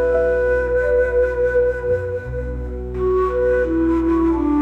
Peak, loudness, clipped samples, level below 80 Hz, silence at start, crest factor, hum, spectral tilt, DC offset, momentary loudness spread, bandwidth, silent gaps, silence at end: -8 dBFS; -19 LUFS; under 0.1%; -30 dBFS; 0 s; 10 dB; none; -9 dB/octave; under 0.1%; 9 LU; 5.8 kHz; none; 0 s